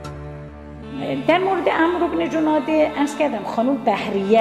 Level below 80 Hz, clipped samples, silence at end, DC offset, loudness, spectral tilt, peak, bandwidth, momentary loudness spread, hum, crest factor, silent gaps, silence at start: -46 dBFS; under 0.1%; 0 s; under 0.1%; -20 LUFS; -6 dB/octave; -4 dBFS; 12.5 kHz; 16 LU; none; 16 dB; none; 0 s